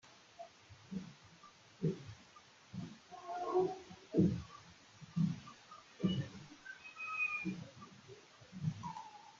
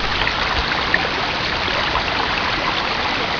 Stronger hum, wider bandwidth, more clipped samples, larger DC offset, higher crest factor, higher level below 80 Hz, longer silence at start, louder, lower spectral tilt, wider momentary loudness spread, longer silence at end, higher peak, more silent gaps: neither; first, 7.6 kHz vs 5.4 kHz; neither; neither; first, 24 dB vs 18 dB; second, -70 dBFS vs -34 dBFS; about the same, 0.05 s vs 0 s; second, -41 LUFS vs -18 LUFS; first, -6 dB/octave vs -3.5 dB/octave; first, 22 LU vs 2 LU; about the same, 0 s vs 0 s; second, -18 dBFS vs -2 dBFS; neither